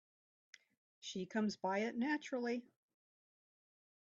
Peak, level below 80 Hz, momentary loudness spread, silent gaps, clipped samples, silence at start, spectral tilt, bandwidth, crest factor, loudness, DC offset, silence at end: -26 dBFS; -88 dBFS; 8 LU; none; under 0.1%; 1.05 s; -4 dB/octave; 7.6 kHz; 18 dB; -41 LUFS; under 0.1%; 1.45 s